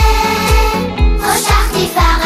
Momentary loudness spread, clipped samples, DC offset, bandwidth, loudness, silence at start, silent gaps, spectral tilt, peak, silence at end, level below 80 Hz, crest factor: 3 LU; under 0.1%; under 0.1%; 16 kHz; -13 LUFS; 0 s; none; -4 dB/octave; 0 dBFS; 0 s; -14 dBFS; 10 dB